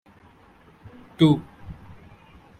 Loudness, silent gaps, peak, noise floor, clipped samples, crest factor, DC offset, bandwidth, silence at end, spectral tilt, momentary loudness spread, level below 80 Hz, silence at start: -21 LUFS; none; -6 dBFS; -53 dBFS; under 0.1%; 22 dB; under 0.1%; 9.2 kHz; 0.85 s; -8 dB/octave; 25 LU; -54 dBFS; 1.2 s